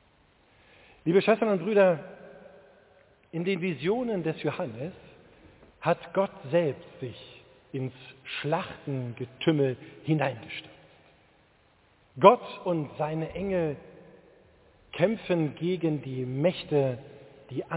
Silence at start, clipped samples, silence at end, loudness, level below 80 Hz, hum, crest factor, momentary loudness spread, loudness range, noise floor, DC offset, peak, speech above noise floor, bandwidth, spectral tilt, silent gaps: 1.05 s; under 0.1%; 0 s; -28 LUFS; -64 dBFS; none; 26 dB; 18 LU; 5 LU; -63 dBFS; under 0.1%; -2 dBFS; 36 dB; 4 kHz; -10.5 dB/octave; none